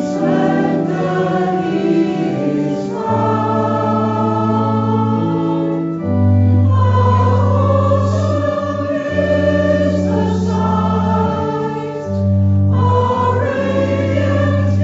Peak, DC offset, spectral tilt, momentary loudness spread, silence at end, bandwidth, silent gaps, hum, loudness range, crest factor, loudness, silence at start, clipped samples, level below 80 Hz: -2 dBFS; under 0.1%; -8.5 dB/octave; 6 LU; 0 s; 7.6 kHz; none; none; 2 LU; 12 dB; -15 LUFS; 0 s; under 0.1%; -48 dBFS